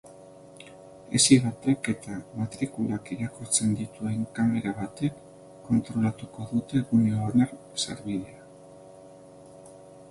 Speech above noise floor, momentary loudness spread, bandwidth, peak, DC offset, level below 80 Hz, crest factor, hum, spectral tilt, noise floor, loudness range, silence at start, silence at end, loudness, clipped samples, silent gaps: 22 dB; 16 LU; 11.5 kHz; -6 dBFS; under 0.1%; -58 dBFS; 22 dB; none; -4.5 dB/octave; -49 dBFS; 4 LU; 0.05 s; 0.05 s; -27 LUFS; under 0.1%; none